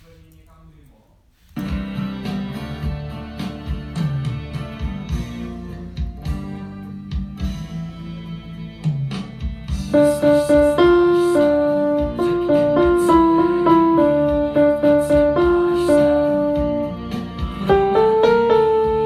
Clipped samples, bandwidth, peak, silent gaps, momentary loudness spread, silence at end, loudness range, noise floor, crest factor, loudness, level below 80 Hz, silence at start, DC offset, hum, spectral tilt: under 0.1%; 13.5 kHz; -2 dBFS; none; 16 LU; 0 s; 13 LU; -54 dBFS; 16 dB; -18 LUFS; -34 dBFS; 1.55 s; under 0.1%; none; -7.5 dB/octave